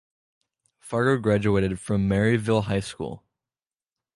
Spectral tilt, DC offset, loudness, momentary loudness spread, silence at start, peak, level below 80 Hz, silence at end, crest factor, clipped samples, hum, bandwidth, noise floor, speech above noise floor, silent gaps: -7 dB/octave; under 0.1%; -24 LUFS; 13 LU; 0.85 s; -8 dBFS; -48 dBFS; 1 s; 18 dB; under 0.1%; none; 11.5 kHz; under -90 dBFS; over 67 dB; none